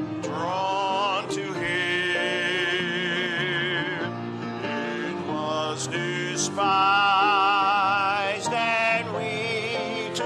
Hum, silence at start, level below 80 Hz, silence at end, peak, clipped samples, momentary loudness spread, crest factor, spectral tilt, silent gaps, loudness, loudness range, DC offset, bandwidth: none; 0 s; -68 dBFS; 0 s; -10 dBFS; under 0.1%; 10 LU; 14 dB; -3.5 dB/octave; none; -24 LUFS; 6 LU; under 0.1%; 13 kHz